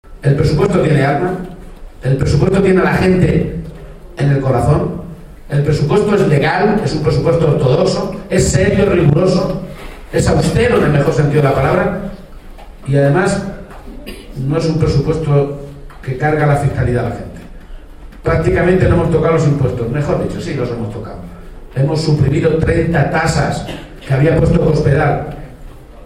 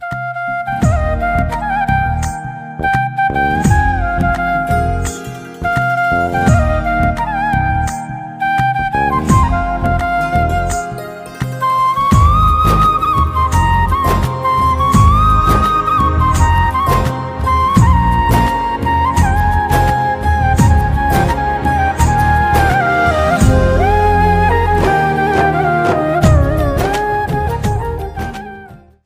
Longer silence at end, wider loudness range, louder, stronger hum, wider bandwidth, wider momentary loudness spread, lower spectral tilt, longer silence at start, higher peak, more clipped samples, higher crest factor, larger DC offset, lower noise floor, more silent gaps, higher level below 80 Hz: second, 0 s vs 0.3 s; about the same, 4 LU vs 3 LU; about the same, -14 LUFS vs -14 LUFS; neither; second, 12 kHz vs 16 kHz; first, 16 LU vs 9 LU; about the same, -7 dB/octave vs -6.5 dB/octave; about the same, 0.1 s vs 0 s; about the same, 0 dBFS vs 0 dBFS; neither; about the same, 14 dB vs 12 dB; neither; about the same, -33 dBFS vs -36 dBFS; neither; second, -30 dBFS vs -20 dBFS